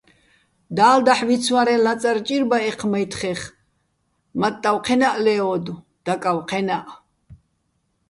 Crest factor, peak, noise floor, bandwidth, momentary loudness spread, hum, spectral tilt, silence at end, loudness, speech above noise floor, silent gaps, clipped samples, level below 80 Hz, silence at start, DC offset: 20 dB; -2 dBFS; -69 dBFS; 11.5 kHz; 12 LU; none; -4.5 dB/octave; 0.75 s; -20 LUFS; 50 dB; none; under 0.1%; -58 dBFS; 0.7 s; under 0.1%